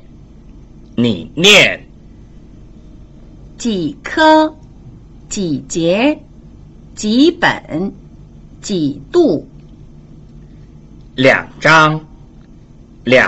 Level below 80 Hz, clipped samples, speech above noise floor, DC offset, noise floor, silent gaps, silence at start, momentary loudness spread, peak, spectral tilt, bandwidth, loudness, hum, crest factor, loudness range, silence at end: -42 dBFS; under 0.1%; 27 dB; under 0.1%; -40 dBFS; none; 0.55 s; 17 LU; 0 dBFS; -4 dB/octave; 14 kHz; -13 LUFS; none; 16 dB; 4 LU; 0 s